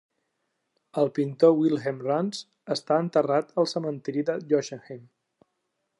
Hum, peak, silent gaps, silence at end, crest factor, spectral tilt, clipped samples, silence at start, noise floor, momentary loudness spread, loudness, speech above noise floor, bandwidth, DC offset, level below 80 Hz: none; -6 dBFS; none; 1 s; 20 dB; -6 dB/octave; under 0.1%; 0.95 s; -78 dBFS; 16 LU; -26 LUFS; 53 dB; 11 kHz; under 0.1%; -80 dBFS